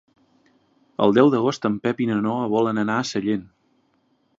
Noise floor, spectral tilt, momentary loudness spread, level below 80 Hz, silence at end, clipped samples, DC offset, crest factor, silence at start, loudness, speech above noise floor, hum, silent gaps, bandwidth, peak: -65 dBFS; -6.5 dB/octave; 9 LU; -64 dBFS; 0.95 s; under 0.1%; under 0.1%; 20 dB; 1 s; -21 LUFS; 45 dB; none; none; 7.8 kHz; -2 dBFS